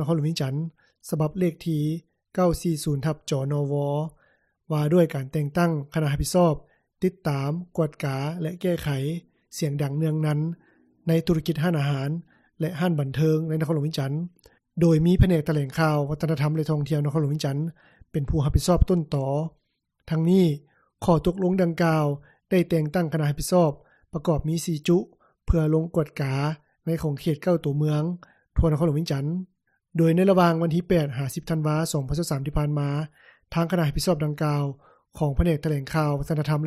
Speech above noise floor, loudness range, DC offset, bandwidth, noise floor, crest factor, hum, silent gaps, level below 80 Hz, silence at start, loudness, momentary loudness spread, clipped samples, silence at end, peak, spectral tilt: 42 dB; 3 LU; under 0.1%; 14 kHz; -65 dBFS; 20 dB; none; none; -38 dBFS; 0 s; -25 LUFS; 10 LU; under 0.1%; 0 s; -4 dBFS; -7 dB/octave